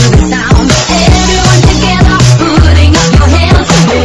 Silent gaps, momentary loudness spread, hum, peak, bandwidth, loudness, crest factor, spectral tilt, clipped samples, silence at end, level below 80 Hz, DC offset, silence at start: none; 2 LU; none; 0 dBFS; 11 kHz; -6 LUFS; 6 dB; -5 dB/octave; 10%; 0 s; -12 dBFS; 2%; 0 s